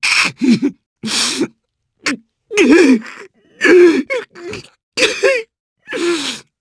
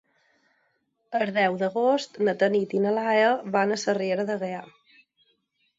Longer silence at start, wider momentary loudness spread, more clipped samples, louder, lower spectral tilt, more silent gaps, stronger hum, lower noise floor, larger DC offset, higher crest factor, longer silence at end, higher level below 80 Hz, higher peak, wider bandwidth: second, 0 s vs 1.1 s; first, 19 LU vs 8 LU; neither; first, -14 LUFS vs -25 LUFS; second, -3 dB/octave vs -5 dB/octave; first, 0.86-0.96 s, 4.83-4.92 s, 5.60-5.76 s vs none; neither; second, -66 dBFS vs -72 dBFS; neither; about the same, 16 dB vs 18 dB; second, 0.2 s vs 1.15 s; first, -56 dBFS vs -76 dBFS; first, 0 dBFS vs -8 dBFS; first, 11 kHz vs 7.8 kHz